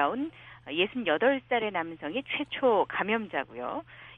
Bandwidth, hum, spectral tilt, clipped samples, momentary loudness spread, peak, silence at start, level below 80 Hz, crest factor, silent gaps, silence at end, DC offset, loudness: 4 kHz; none; -7 dB/octave; under 0.1%; 11 LU; -10 dBFS; 0 s; -66 dBFS; 20 dB; none; 0 s; under 0.1%; -29 LUFS